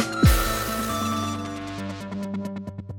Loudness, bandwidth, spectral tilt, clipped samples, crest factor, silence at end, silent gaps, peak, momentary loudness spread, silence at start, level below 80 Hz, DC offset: -26 LUFS; 17.5 kHz; -5 dB/octave; under 0.1%; 18 dB; 0 s; none; -6 dBFS; 13 LU; 0 s; -32 dBFS; under 0.1%